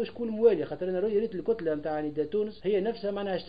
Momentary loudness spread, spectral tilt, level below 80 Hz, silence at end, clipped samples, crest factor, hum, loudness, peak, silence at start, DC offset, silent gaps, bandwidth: 7 LU; -9.5 dB/octave; -60 dBFS; 0 s; under 0.1%; 18 dB; none; -29 LUFS; -10 dBFS; 0 s; 0.3%; none; 5 kHz